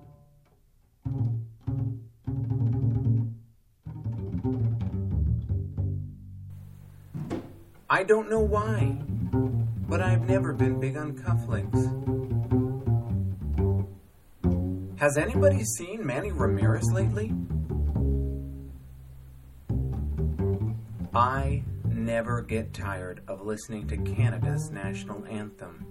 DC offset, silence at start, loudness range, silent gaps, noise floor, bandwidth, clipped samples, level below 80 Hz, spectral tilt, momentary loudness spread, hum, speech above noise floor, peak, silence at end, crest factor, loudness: under 0.1%; 0.05 s; 5 LU; none; -62 dBFS; 13.5 kHz; under 0.1%; -38 dBFS; -7 dB/octave; 15 LU; none; 35 dB; -8 dBFS; 0 s; 20 dB; -28 LUFS